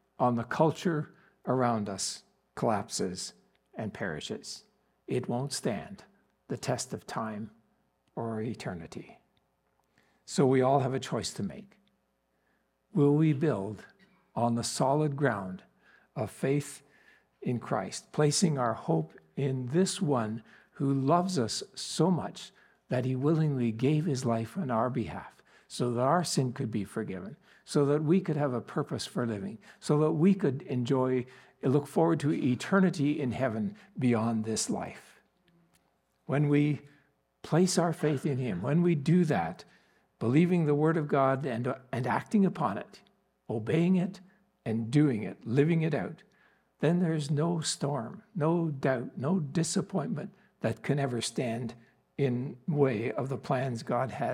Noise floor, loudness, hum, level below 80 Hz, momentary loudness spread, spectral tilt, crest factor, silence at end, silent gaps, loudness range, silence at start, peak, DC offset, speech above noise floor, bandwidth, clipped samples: -75 dBFS; -30 LUFS; none; -72 dBFS; 14 LU; -6 dB/octave; 20 dB; 0 s; none; 7 LU; 0.2 s; -12 dBFS; under 0.1%; 46 dB; 14.5 kHz; under 0.1%